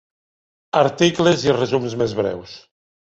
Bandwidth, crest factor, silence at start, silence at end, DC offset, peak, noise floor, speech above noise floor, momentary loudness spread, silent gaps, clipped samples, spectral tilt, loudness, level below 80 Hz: 8.2 kHz; 18 dB; 0.75 s; 0.5 s; under 0.1%; -2 dBFS; under -90 dBFS; over 72 dB; 9 LU; none; under 0.1%; -5 dB/octave; -19 LUFS; -54 dBFS